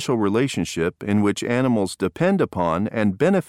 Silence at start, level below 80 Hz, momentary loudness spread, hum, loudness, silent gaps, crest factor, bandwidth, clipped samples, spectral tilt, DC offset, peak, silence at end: 0 s; -52 dBFS; 3 LU; none; -21 LUFS; none; 14 dB; 15 kHz; under 0.1%; -6 dB/octave; under 0.1%; -6 dBFS; 0.05 s